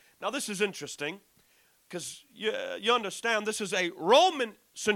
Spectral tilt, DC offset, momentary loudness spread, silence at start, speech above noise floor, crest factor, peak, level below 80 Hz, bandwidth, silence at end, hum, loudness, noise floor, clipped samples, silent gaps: -2.5 dB/octave; under 0.1%; 17 LU; 0.2 s; 36 dB; 22 dB; -8 dBFS; -78 dBFS; 17 kHz; 0 s; none; -29 LUFS; -65 dBFS; under 0.1%; none